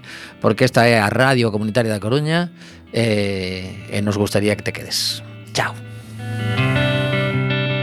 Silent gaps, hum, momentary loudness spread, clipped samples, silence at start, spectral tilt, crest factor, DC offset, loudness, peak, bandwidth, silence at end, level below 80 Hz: none; none; 13 LU; under 0.1%; 0.05 s; -5.5 dB/octave; 20 dB; under 0.1%; -19 LUFS; 0 dBFS; 15 kHz; 0 s; -50 dBFS